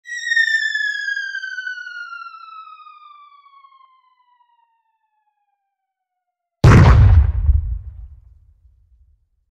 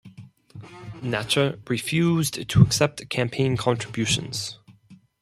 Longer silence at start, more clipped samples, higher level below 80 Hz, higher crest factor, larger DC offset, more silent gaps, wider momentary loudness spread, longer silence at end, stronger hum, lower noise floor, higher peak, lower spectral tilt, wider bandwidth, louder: about the same, 0.1 s vs 0.05 s; neither; first, -24 dBFS vs -48 dBFS; about the same, 18 dB vs 22 dB; neither; neither; first, 25 LU vs 15 LU; first, 1.45 s vs 0.25 s; neither; first, -79 dBFS vs -53 dBFS; about the same, 0 dBFS vs -2 dBFS; first, -6.5 dB/octave vs -5 dB/octave; second, 8.4 kHz vs 15 kHz; first, -15 LUFS vs -23 LUFS